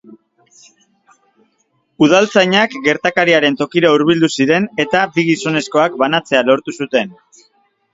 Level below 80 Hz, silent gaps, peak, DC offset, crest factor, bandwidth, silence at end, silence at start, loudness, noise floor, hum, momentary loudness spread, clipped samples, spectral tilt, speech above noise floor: -60 dBFS; none; 0 dBFS; under 0.1%; 16 dB; 7.8 kHz; 0.8 s; 2 s; -14 LUFS; -63 dBFS; none; 5 LU; under 0.1%; -4.5 dB/octave; 49 dB